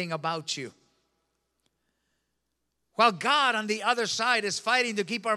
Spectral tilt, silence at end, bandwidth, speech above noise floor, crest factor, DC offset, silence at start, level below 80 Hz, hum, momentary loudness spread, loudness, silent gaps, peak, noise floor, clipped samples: -2.5 dB/octave; 0 s; 14.5 kHz; 52 dB; 22 dB; under 0.1%; 0 s; -84 dBFS; none; 11 LU; -26 LUFS; none; -8 dBFS; -79 dBFS; under 0.1%